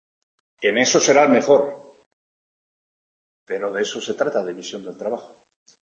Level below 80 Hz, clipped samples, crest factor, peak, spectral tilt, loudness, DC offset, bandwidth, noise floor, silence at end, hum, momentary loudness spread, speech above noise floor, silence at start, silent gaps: -70 dBFS; under 0.1%; 20 dB; -2 dBFS; -3 dB/octave; -18 LUFS; under 0.1%; 8.2 kHz; under -90 dBFS; 0.6 s; none; 17 LU; over 72 dB; 0.6 s; 2.06-3.46 s